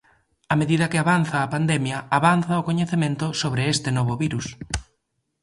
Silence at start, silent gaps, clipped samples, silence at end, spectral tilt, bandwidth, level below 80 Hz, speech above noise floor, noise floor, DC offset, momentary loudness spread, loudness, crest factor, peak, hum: 0.5 s; none; under 0.1%; 0.6 s; -5.5 dB/octave; 11.5 kHz; -46 dBFS; 53 dB; -74 dBFS; under 0.1%; 9 LU; -22 LUFS; 20 dB; -4 dBFS; none